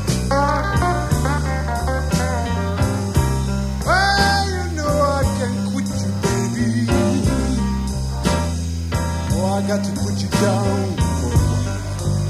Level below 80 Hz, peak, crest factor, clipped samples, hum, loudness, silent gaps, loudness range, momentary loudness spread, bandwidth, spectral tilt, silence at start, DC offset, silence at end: -26 dBFS; -2 dBFS; 16 dB; under 0.1%; none; -20 LUFS; none; 2 LU; 5 LU; 15.5 kHz; -5.5 dB/octave; 0 s; under 0.1%; 0 s